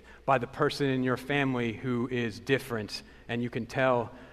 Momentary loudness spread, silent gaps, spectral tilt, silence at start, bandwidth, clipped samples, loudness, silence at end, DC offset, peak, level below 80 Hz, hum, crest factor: 8 LU; none; -6 dB/octave; 0.05 s; 13.5 kHz; under 0.1%; -30 LUFS; 0 s; under 0.1%; -12 dBFS; -58 dBFS; none; 20 dB